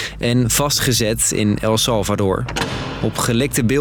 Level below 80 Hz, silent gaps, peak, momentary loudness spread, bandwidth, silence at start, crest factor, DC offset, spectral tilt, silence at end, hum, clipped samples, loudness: -36 dBFS; none; -6 dBFS; 7 LU; 19.5 kHz; 0 s; 12 dB; under 0.1%; -4 dB/octave; 0 s; none; under 0.1%; -17 LUFS